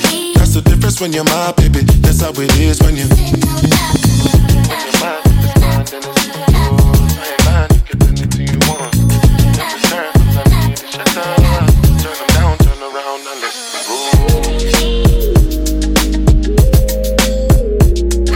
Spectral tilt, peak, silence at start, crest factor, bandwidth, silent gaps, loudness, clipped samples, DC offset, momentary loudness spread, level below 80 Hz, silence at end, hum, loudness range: -5 dB/octave; 0 dBFS; 0 s; 10 dB; 17 kHz; none; -12 LUFS; under 0.1%; under 0.1%; 5 LU; -14 dBFS; 0 s; none; 2 LU